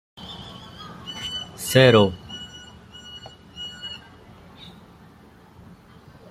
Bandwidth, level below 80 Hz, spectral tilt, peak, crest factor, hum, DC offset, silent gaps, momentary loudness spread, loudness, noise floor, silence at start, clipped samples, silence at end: 15.5 kHz; -54 dBFS; -5 dB/octave; -2 dBFS; 24 dB; none; under 0.1%; none; 27 LU; -20 LUFS; -50 dBFS; 0.2 s; under 0.1%; 2.35 s